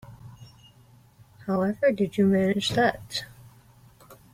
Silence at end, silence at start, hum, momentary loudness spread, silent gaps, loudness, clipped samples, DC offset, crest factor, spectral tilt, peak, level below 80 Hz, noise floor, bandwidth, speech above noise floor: 0.2 s; 0.05 s; none; 24 LU; none; -25 LUFS; under 0.1%; under 0.1%; 18 dB; -5.5 dB/octave; -10 dBFS; -60 dBFS; -55 dBFS; 15.5 kHz; 32 dB